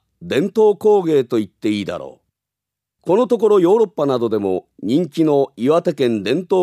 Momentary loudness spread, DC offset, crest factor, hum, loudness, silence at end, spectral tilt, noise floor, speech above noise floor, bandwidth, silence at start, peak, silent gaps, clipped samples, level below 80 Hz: 9 LU; under 0.1%; 14 dB; none; -17 LUFS; 0 s; -7 dB/octave; -84 dBFS; 68 dB; 13.5 kHz; 0.2 s; -4 dBFS; none; under 0.1%; -64 dBFS